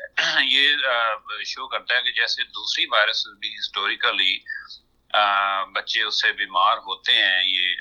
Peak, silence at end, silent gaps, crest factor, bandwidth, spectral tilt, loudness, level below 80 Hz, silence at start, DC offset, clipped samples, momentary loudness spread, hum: -4 dBFS; 0 s; none; 18 dB; 11 kHz; 0.5 dB/octave; -20 LUFS; -68 dBFS; 0 s; under 0.1%; under 0.1%; 12 LU; none